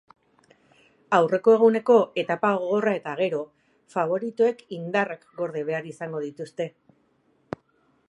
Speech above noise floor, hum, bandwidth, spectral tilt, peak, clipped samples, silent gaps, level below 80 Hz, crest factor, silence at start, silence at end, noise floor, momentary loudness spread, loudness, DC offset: 42 dB; none; 9.4 kHz; -6.5 dB/octave; -4 dBFS; under 0.1%; none; -74 dBFS; 20 dB; 1.1 s; 1.4 s; -66 dBFS; 16 LU; -24 LUFS; under 0.1%